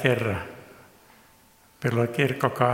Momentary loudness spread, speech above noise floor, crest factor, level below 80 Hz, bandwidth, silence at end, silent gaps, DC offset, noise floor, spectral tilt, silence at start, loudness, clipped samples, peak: 14 LU; 33 dB; 24 dB; -58 dBFS; 16.5 kHz; 0 s; none; under 0.1%; -57 dBFS; -6.5 dB/octave; 0 s; -26 LUFS; under 0.1%; -4 dBFS